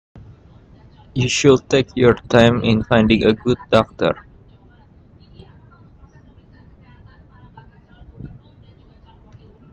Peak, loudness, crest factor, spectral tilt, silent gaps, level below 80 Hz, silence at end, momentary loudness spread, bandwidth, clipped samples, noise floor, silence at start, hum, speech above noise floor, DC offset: 0 dBFS; -16 LUFS; 20 dB; -5.5 dB/octave; none; -44 dBFS; 1.45 s; 19 LU; 8.8 kHz; under 0.1%; -48 dBFS; 1.15 s; none; 33 dB; under 0.1%